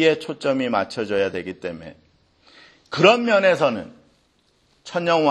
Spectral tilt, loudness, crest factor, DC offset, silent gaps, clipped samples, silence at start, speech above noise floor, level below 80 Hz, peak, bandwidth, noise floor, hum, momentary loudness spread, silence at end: -5 dB/octave; -20 LUFS; 22 dB; under 0.1%; none; under 0.1%; 0 s; 43 dB; -64 dBFS; 0 dBFS; 11 kHz; -63 dBFS; none; 16 LU; 0 s